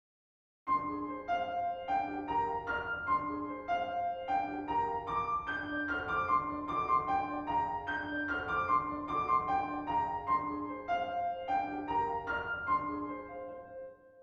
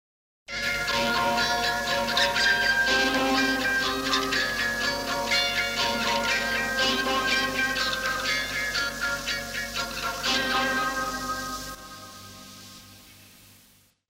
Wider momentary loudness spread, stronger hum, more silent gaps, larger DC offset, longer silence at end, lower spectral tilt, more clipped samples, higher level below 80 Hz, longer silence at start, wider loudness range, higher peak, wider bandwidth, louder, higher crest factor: second, 8 LU vs 13 LU; neither; neither; neither; second, 0 s vs 0.8 s; first, -6.5 dB/octave vs -1.5 dB/octave; neither; second, -60 dBFS vs -48 dBFS; first, 0.65 s vs 0.5 s; second, 2 LU vs 6 LU; second, -18 dBFS vs -12 dBFS; second, 7.4 kHz vs 16 kHz; second, -34 LUFS vs -24 LUFS; about the same, 16 dB vs 16 dB